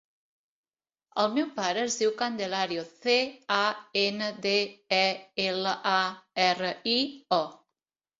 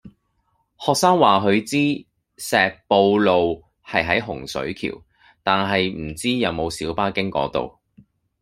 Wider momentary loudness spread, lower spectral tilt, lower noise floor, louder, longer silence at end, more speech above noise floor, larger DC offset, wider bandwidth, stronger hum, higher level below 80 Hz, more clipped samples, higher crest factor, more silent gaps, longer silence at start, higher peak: second, 5 LU vs 13 LU; second, -3 dB/octave vs -4.5 dB/octave; first, -88 dBFS vs -68 dBFS; second, -28 LUFS vs -20 LUFS; about the same, 0.65 s vs 0.7 s; first, 60 dB vs 48 dB; neither; second, 7.8 kHz vs 16 kHz; neither; second, -74 dBFS vs -52 dBFS; neither; about the same, 20 dB vs 20 dB; neither; first, 1.15 s vs 0.05 s; second, -8 dBFS vs 0 dBFS